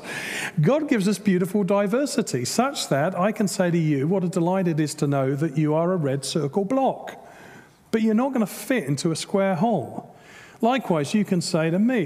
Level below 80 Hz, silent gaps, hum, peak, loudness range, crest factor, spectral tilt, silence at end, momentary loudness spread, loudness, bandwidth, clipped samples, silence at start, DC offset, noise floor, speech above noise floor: -68 dBFS; none; none; -6 dBFS; 2 LU; 18 dB; -6 dB/octave; 0 s; 4 LU; -23 LUFS; 16 kHz; under 0.1%; 0 s; under 0.1%; -48 dBFS; 26 dB